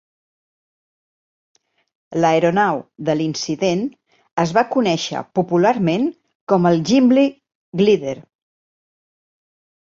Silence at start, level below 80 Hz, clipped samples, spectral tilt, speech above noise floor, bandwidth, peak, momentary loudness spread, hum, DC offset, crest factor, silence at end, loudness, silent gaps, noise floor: 2.1 s; -62 dBFS; under 0.1%; -6 dB/octave; over 73 dB; 7.6 kHz; -2 dBFS; 12 LU; none; under 0.1%; 18 dB; 1.7 s; -18 LUFS; 4.31-4.36 s, 6.35-6.47 s, 7.55-7.72 s; under -90 dBFS